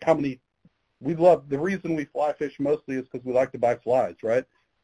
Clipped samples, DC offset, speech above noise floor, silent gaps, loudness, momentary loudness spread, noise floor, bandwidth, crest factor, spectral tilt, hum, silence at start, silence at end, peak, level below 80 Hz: under 0.1%; under 0.1%; 40 dB; none; -25 LUFS; 12 LU; -64 dBFS; 10.5 kHz; 20 dB; -7.5 dB/octave; none; 0 s; 0.4 s; -6 dBFS; -62 dBFS